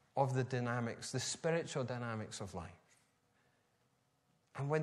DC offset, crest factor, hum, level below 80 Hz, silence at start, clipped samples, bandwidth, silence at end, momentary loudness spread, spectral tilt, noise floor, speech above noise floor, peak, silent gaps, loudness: under 0.1%; 22 dB; none; -74 dBFS; 0.15 s; under 0.1%; 13 kHz; 0 s; 12 LU; -5 dB/octave; -78 dBFS; 39 dB; -20 dBFS; none; -40 LUFS